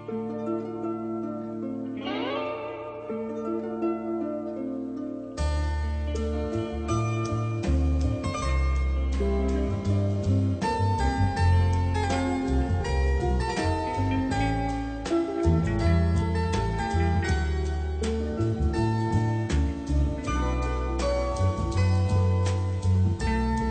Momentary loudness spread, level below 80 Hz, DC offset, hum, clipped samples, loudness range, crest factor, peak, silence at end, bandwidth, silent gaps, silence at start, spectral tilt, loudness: 8 LU; -32 dBFS; under 0.1%; none; under 0.1%; 6 LU; 14 dB; -12 dBFS; 0 s; 9 kHz; none; 0 s; -7 dB/octave; -27 LUFS